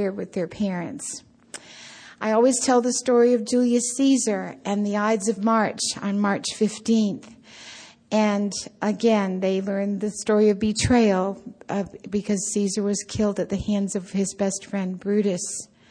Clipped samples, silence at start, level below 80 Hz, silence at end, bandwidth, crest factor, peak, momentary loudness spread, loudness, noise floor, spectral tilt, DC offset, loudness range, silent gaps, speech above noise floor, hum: under 0.1%; 0 s; -52 dBFS; 0.25 s; 10.5 kHz; 16 dB; -8 dBFS; 14 LU; -23 LUFS; -45 dBFS; -4.5 dB/octave; under 0.1%; 4 LU; none; 22 dB; none